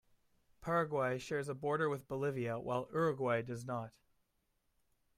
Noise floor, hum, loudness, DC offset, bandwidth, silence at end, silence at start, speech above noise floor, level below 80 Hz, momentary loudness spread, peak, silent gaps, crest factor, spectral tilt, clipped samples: -80 dBFS; none; -38 LUFS; under 0.1%; 15.5 kHz; 1.3 s; 0.6 s; 43 dB; -70 dBFS; 8 LU; -22 dBFS; none; 16 dB; -6.5 dB/octave; under 0.1%